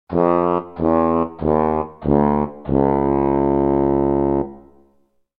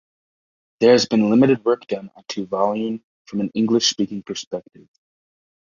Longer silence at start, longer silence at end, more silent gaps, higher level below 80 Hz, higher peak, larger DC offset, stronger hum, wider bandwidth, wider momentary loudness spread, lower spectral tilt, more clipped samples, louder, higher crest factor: second, 0.1 s vs 0.8 s; second, 0.8 s vs 1.1 s; second, none vs 3.04-3.25 s, 4.47-4.51 s; first, -36 dBFS vs -62 dBFS; about the same, -2 dBFS vs -2 dBFS; neither; neither; second, 4.3 kHz vs 7.4 kHz; second, 4 LU vs 15 LU; first, -12 dB/octave vs -4.5 dB/octave; neither; about the same, -18 LUFS vs -20 LUFS; about the same, 18 dB vs 18 dB